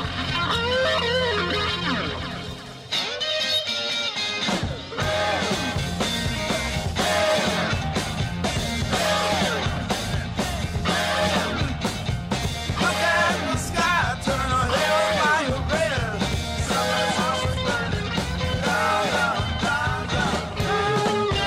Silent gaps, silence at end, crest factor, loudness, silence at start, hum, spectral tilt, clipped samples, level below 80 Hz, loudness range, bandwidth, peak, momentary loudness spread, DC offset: none; 0 s; 14 dB; -23 LUFS; 0 s; none; -4 dB/octave; under 0.1%; -38 dBFS; 2 LU; 16 kHz; -10 dBFS; 6 LU; under 0.1%